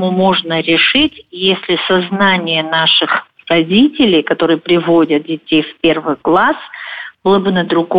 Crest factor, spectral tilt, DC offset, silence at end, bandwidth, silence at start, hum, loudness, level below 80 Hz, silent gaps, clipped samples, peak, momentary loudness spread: 10 dB; -8 dB/octave; under 0.1%; 0 s; 5.2 kHz; 0 s; none; -12 LUFS; -50 dBFS; none; under 0.1%; -2 dBFS; 6 LU